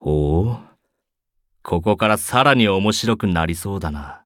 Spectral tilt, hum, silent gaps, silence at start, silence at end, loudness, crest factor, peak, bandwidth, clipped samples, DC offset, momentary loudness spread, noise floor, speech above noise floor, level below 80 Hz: -5 dB/octave; none; none; 0 s; 0.1 s; -19 LUFS; 18 dB; -2 dBFS; 18 kHz; under 0.1%; under 0.1%; 11 LU; -77 dBFS; 58 dB; -36 dBFS